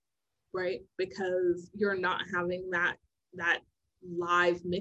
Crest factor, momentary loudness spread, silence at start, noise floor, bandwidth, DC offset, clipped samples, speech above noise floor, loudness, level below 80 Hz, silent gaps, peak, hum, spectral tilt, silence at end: 20 dB; 11 LU; 0.55 s; -86 dBFS; 8.2 kHz; under 0.1%; under 0.1%; 55 dB; -31 LUFS; -66 dBFS; none; -12 dBFS; none; -5 dB/octave; 0 s